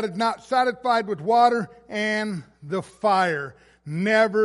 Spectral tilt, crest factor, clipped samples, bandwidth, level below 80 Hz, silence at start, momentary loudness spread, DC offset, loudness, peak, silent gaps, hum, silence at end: -5.5 dB/octave; 18 dB; under 0.1%; 11.5 kHz; -66 dBFS; 0 s; 12 LU; under 0.1%; -23 LUFS; -4 dBFS; none; none; 0 s